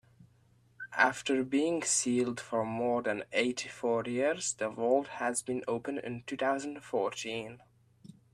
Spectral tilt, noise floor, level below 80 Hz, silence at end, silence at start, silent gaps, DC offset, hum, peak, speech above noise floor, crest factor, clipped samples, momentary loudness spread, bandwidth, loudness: -3 dB/octave; -66 dBFS; -74 dBFS; 0.75 s; 0.2 s; none; under 0.1%; none; -10 dBFS; 34 dB; 24 dB; under 0.1%; 10 LU; 13.5 kHz; -32 LUFS